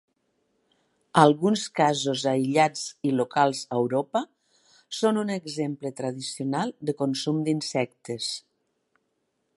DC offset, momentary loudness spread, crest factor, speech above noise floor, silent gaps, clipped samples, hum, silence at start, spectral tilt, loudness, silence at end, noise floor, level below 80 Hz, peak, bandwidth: under 0.1%; 11 LU; 24 dB; 51 dB; none; under 0.1%; none; 1.15 s; -5 dB/octave; -26 LUFS; 1.2 s; -76 dBFS; -76 dBFS; -2 dBFS; 11.5 kHz